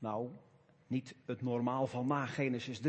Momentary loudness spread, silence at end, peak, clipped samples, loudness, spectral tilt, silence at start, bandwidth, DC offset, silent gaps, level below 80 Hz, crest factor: 9 LU; 0 s; -20 dBFS; under 0.1%; -38 LUFS; -7 dB/octave; 0 s; 8.4 kHz; under 0.1%; none; -78 dBFS; 18 dB